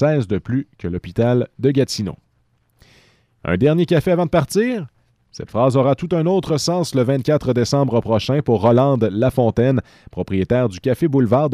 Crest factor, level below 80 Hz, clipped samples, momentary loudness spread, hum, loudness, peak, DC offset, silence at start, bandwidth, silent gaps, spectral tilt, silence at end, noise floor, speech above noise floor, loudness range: 14 dB; -46 dBFS; under 0.1%; 10 LU; none; -18 LUFS; -4 dBFS; under 0.1%; 0 s; 14.5 kHz; none; -7 dB/octave; 0 s; -62 dBFS; 45 dB; 4 LU